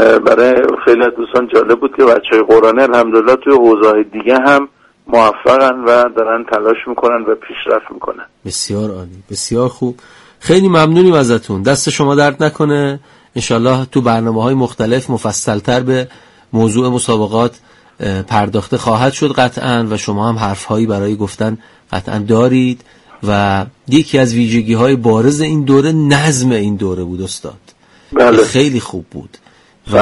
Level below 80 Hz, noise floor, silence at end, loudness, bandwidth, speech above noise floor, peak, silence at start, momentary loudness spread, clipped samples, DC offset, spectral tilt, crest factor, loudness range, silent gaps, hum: -44 dBFS; -46 dBFS; 0 s; -12 LUFS; 12 kHz; 34 dB; 0 dBFS; 0 s; 13 LU; under 0.1%; under 0.1%; -5.5 dB/octave; 12 dB; 6 LU; none; none